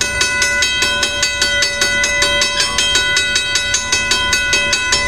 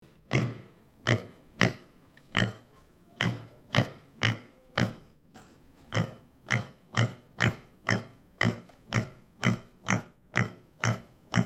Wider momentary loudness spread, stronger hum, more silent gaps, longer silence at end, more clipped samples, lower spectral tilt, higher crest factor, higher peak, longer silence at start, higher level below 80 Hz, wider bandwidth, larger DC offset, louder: second, 2 LU vs 9 LU; neither; neither; about the same, 0 s vs 0 s; neither; second, 0 dB/octave vs -5 dB/octave; second, 16 dB vs 28 dB; first, 0 dBFS vs -4 dBFS; second, 0 s vs 0.3 s; first, -36 dBFS vs -58 dBFS; first, 16 kHz vs 10.5 kHz; first, 1% vs under 0.1%; first, -13 LUFS vs -31 LUFS